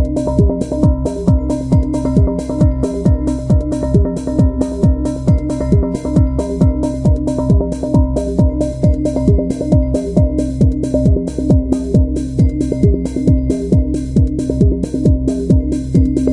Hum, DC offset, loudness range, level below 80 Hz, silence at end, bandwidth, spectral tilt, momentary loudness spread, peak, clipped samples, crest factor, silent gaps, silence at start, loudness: none; under 0.1%; 1 LU; -20 dBFS; 0 s; 11 kHz; -9.5 dB/octave; 2 LU; 0 dBFS; under 0.1%; 14 dB; none; 0 s; -15 LUFS